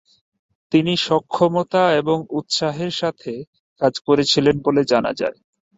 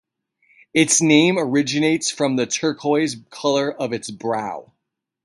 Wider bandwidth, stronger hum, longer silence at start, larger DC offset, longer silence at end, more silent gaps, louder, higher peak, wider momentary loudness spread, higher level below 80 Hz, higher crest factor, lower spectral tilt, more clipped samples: second, 8 kHz vs 11.5 kHz; neither; about the same, 0.7 s vs 0.75 s; neither; second, 0.45 s vs 0.65 s; first, 3.47-3.53 s, 3.60-3.76 s vs none; about the same, -19 LUFS vs -19 LUFS; about the same, -2 dBFS vs -2 dBFS; about the same, 9 LU vs 11 LU; first, -56 dBFS vs -64 dBFS; about the same, 18 dB vs 20 dB; first, -5 dB/octave vs -3.5 dB/octave; neither